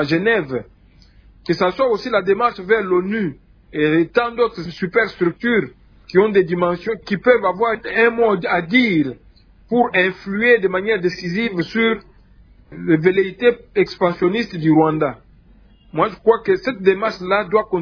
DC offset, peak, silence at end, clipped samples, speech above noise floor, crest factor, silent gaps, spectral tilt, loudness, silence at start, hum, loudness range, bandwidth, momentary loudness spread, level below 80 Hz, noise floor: under 0.1%; -2 dBFS; 0 s; under 0.1%; 31 dB; 16 dB; none; -7.5 dB/octave; -18 LUFS; 0 s; none; 2 LU; 5.4 kHz; 8 LU; -50 dBFS; -49 dBFS